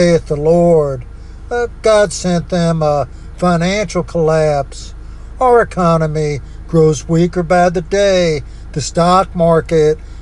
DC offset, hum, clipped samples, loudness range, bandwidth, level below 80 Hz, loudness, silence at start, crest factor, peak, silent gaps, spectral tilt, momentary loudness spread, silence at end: under 0.1%; none; under 0.1%; 2 LU; 11 kHz; -30 dBFS; -14 LUFS; 0 s; 12 dB; 0 dBFS; none; -6 dB/octave; 12 LU; 0 s